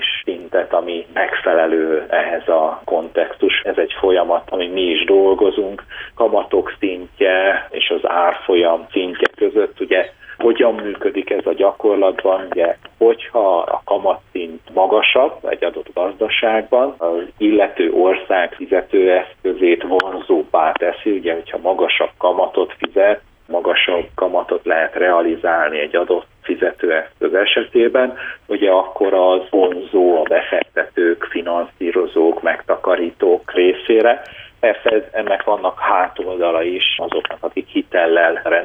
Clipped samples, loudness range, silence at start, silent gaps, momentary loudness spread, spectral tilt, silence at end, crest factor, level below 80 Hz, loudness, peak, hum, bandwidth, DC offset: under 0.1%; 2 LU; 0 s; none; 7 LU; -6 dB/octave; 0 s; 16 dB; -54 dBFS; -16 LUFS; 0 dBFS; none; 4.8 kHz; under 0.1%